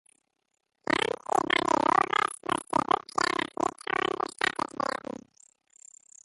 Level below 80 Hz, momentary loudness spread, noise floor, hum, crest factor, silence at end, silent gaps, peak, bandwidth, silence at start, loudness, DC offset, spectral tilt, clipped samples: -64 dBFS; 8 LU; -79 dBFS; none; 20 dB; 1.6 s; none; -10 dBFS; 12 kHz; 0.9 s; -28 LUFS; under 0.1%; -3 dB/octave; under 0.1%